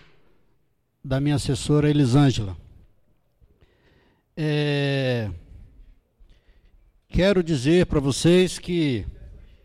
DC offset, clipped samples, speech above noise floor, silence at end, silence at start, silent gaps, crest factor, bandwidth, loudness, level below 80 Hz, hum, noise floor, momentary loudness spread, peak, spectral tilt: under 0.1%; under 0.1%; 48 dB; 0.25 s; 1.05 s; none; 14 dB; 13 kHz; -22 LUFS; -42 dBFS; none; -69 dBFS; 16 LU; -10 dBFS; -6 dB/octave